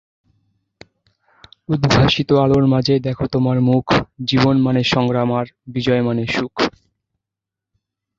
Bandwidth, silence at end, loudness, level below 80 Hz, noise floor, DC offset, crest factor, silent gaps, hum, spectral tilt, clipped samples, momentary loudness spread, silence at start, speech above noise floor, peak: 7.6 kHz; 1.5 s; -17 LUFS; -42 dBFS; -85 dBFS; under 0.1%; 16 dB; none; none; -6.5 dB/octave; under 0.1%; 7 LU; 1.7 s; 69 dB; -2 dBFS